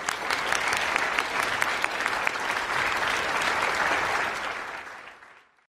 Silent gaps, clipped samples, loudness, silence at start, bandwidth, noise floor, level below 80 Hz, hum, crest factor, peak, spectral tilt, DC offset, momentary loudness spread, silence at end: none; under 0.1%; -26 LUFS; 0 s; 16 kHz; -53 dBFS; -58 dBFS; none; 22 dB; -6 dBFS; -1 dB/octave; under 0.1%; 10 LU; 0.4 s